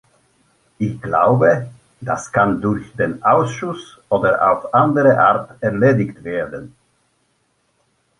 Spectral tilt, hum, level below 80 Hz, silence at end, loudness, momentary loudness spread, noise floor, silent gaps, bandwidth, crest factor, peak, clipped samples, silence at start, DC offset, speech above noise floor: -7.5 dB/octave; none; -52 dBFS; 1.5 s; -17 LUFS; 13 LU; -65 dBFS; none; 11.5 kHz; 16 dB; -2 dBFS; under 0.1%; 0.8 s; under 0.1%; 48 dB